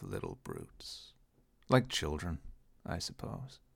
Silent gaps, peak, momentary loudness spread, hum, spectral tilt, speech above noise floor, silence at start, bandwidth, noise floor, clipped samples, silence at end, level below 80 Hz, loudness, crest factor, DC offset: none; -12 dBFS; 17 LU; none; -5 dB/octave; 32 dB; 0 s; 16.5 kHz; -68 dBFS; under 0.1%; 0.2 s; -52 dBFS; -38 LUFS; 26 dB; under 0.1%